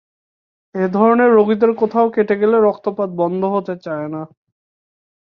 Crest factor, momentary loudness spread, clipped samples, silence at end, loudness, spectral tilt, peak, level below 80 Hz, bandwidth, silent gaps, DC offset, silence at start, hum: 16 dB; 13 LU; under 0.1%; 1.05 s; -16 LUFS; -9.5 dB/octave; -2 dBFS; -64 dBFS; 5.4 kHz; none; under 0.1%; 0.75 s; none